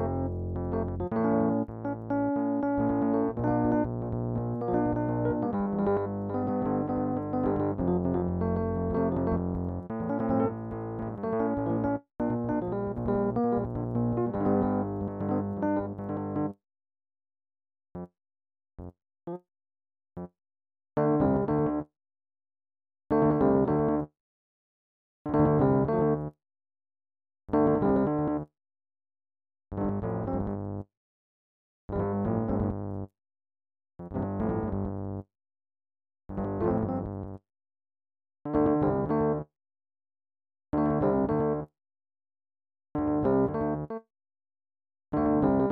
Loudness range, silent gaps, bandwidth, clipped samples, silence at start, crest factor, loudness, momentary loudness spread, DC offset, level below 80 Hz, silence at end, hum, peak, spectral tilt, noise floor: 8 LU; 24.20-25.25 s, 30.97-31.88 s; 4.1 kHz; under 0.1%; 0 s; 18 dB; -29 LUFS; 16 LU; under 0.1%; -48 dBFS; 0 s; none; -12 dBFS; -12.5 dB/octave; under -90 dBFS